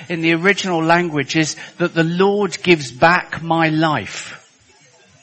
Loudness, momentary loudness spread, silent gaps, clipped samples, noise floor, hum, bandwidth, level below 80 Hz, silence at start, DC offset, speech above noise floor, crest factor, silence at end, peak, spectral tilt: -16 LUFS; 8 LU; none; under 0.1%; -51 dBFS; none; 8.8 kHz; -56 dBFS; 0 s; under 0.1%; 34 dB; 18 dB; 0.85 s; 0 dBFS; -5 dB/octave